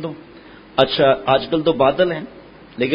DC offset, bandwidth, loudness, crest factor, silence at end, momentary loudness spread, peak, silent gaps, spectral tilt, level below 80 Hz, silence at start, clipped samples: under 0.1%; 5.4 kHz; -17 LUFS; 18 dB; 0 s; 21 LU; 0 dBFS; none; -8 dB/octave; -50 dBFS; 0 s; under 0.1%